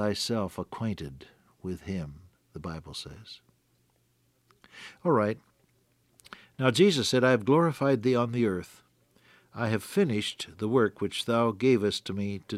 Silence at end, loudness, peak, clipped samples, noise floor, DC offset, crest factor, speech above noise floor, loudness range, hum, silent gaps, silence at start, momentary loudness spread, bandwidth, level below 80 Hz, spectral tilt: 0 s; -28 LUFS; -8 dBFS; under 0.1%; -70 dBFS; under 0.1%; 20 dB; 42 dB; 15 LU; none; none; 0 s; 20 LU; 15.5 kHz; -62 dBFS; -5.5 dB/octave